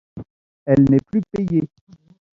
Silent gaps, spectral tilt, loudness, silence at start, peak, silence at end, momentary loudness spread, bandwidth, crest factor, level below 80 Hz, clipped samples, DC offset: 0.30-0.66 s; -10.5 dB/octave; -18 LUFS; 0.15 s; -2 dBFS; 0.7 s; 22 LU; 6.8 kHz; 18 dB; -48 dBFS; under 0.1%; under 0.1%